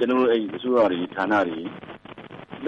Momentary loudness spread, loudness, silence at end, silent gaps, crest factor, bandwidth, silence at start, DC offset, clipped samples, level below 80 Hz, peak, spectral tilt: 21 LU; -23 LUFS; 0 s; none; 14 dB; 7.4 kHz; 0 s; under 0.1%; under 0.1%; -64 dBFS; -10 dBFS; -7 dB/octave